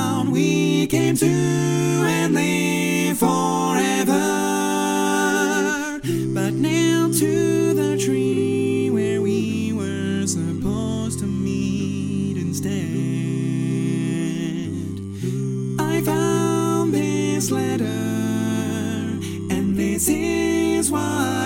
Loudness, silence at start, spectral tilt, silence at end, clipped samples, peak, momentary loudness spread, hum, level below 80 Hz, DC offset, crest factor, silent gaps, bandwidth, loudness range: -21 LUFS; 0 s; -5 dB/octave; 0 s; under 0.1%; -4 dBFS; 6 LU; none; -50 dBFS; under 0.1%; 16 dB; none; 17 kHz; 5 LU